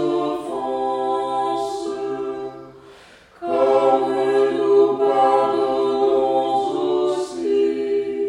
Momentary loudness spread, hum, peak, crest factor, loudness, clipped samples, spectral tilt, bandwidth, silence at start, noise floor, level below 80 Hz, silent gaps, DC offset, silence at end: 10 LU; none; -6 dBFS; 14 dB; -20 LUFS; under 0.1%; -5.5 dB/octave; 10.5 kHz; 0 s; -47 dBFS; -60 dBFS; none; under 0.1%; 0 s